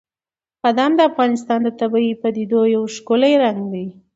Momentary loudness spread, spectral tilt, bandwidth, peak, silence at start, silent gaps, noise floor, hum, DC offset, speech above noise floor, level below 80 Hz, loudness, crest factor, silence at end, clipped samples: 7 LU; -5.5 dB/octave; 8 kHz; -2 dBFS; 0.65 s; none; under -90 dBFS; none; under 0.1%; over 73 dB; -66 dBFS; -17 LUFS; 16 dB; 0.25 s; under 0.1%